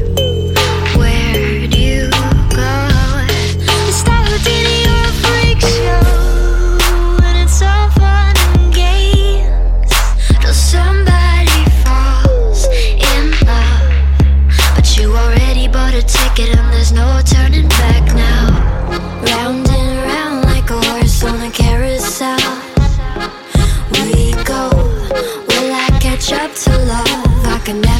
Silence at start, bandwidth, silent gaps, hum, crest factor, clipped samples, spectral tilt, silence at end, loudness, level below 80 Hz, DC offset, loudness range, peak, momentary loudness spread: 0 s; 17 kHz; none; none; 10 dB; under 0.1%; -4.5 dB/octave; 0 s; -12 LUFS; -12 dBFS; under 0.1%; 3 LU; 0 dBFS; 5 LU